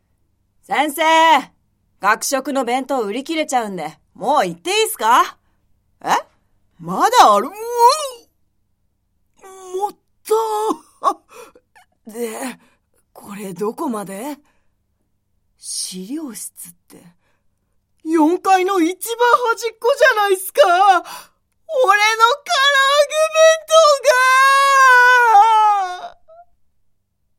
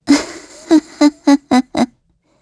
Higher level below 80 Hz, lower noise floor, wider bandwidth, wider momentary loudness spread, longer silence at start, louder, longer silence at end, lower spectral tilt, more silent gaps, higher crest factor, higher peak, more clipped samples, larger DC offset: second, -66 dBFS vs -52 dBFS; first, -67 dBFS vs -58 dBFS; first, 16.5 kHz vs 11 kHz; first, 19 LU vs 11 LU; first, 0.7 s vs 0.05 s; about the same, -15 LUFS vs -14 LUFS; first, 1.3 s vs 0.55 s; second, -2 dB/octave vs -3.5 dB/octave; neither; about the same, 18 dB vs 14 dB; about the same, 0 dBFS vs 0 dBFS; neither; neither